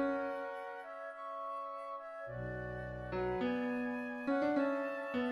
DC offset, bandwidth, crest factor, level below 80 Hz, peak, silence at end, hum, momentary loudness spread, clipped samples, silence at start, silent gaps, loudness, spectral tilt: under 0.1%; 11.5 kHz; 16 dB; -60 dBFS; -22 dBFS; 0 s; none; 11 LU; under 0.1%; 0 s; none; -39 LUFS; -7.5 dB/octave